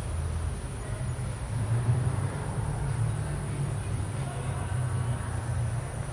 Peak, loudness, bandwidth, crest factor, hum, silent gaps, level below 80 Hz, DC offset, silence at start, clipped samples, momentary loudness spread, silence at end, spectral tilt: -16 dBFS; -32 LUFS; 11.5 kHz; 16 dB; none; none; -40 dBFS; under 0.1%; 0 s; under 0.1%; 6 LU; 0 s; -6.5 dB/octave